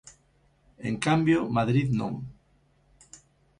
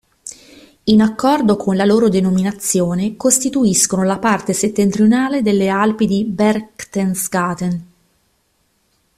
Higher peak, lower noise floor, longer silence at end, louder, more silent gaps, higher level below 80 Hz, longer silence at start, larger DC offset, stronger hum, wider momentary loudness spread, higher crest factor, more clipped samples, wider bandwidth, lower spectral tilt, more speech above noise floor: second, -10 dBFS vs 0 dBFS; about the same, -65 dBFS vs -63 dBFS; about the same, 1.25 s vs 1.35 s; second, -26 LUFS vs -15 LUFS; neither; second, -56 dBFS vs -50 dBFS; second, 0.05 s vs 0.25 s; neither; neither; first, 15 LU vs 9 LU; about the same, 18 dB vs 16 dB; neither; second, 11 kHz vs 14.5 kHz; first, -6.5 dB/octave vs -5 dB/octave; second, 40 dB vs 48 dB